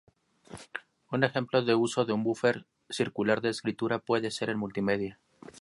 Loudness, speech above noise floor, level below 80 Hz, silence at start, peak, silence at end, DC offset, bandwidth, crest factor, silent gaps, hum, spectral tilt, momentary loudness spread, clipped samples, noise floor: -30 LUFS; 22 dB; -68 dBFS; 0.5 s; -8 dBFS; 0 s; under 0.1%; 11.5 kHz; 24 dB; none; none; -5.5 dB/octave; 15 LU; under 0.1%; -51 dBFS